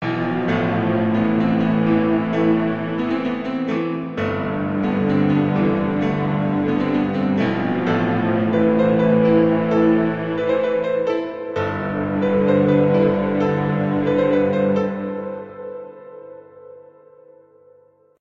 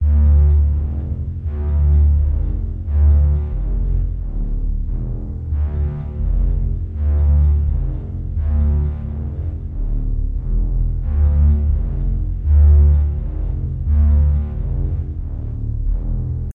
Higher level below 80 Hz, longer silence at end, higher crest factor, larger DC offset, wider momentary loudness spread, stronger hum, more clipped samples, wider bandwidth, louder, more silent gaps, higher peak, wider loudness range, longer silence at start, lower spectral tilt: second, -52 dBFS vs -16 dBFS; first, 1.4 s vs 0.05 s; about the same, 16 dB vs 12 dB; neither; second, 8 LU vs 11 LU; neither; neither; first, 6.8 kHz vs 1.8 kHz; about the same, -19 LUFS vs -19 LUFS; neither; about the same, -4 dBFS vs -4 dBFS; about the same, 5 LU vs 5 LU; about the same, 0 s vs 0 s; second, -9 dB/octave vs -12.5 dB/octave